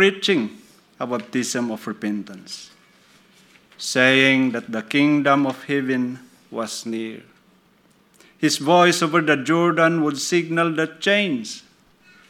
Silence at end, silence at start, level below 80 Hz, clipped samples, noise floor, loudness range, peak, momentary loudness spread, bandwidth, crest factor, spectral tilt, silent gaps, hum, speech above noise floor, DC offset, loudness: 0.7 s; 0 s; -74 dBFS; under 0.1%; -57 dBFS; 8 LU; 0 dBFS; 17 LU; 16 kHz; 22 dB; -4 dB/octave; none; none; 37 dB; under 0.1%; -20 LUFS